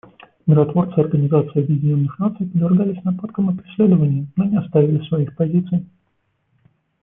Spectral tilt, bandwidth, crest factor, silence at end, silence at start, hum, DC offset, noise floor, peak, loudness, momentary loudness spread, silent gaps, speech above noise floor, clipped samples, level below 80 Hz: -14 dB/octave; 3.7 kHz; 16 dB; 1.15 s; 0.45 s; none; under 0.1%; -68 dBFS; -2 dBFS; -18 LUFS; 7 LU; none; 50 dB; under 0.1%; -56 dBFS